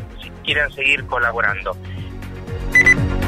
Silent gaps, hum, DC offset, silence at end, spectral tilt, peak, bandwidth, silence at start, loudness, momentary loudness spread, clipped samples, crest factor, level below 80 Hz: none; none; under 0.1%; 0 s; -4 dB/octave; -2 dBFS; 15.5 kHz; 0 s; -16 LUFS; 20 LU; under 0.1%; 16 dB; -32 dBFS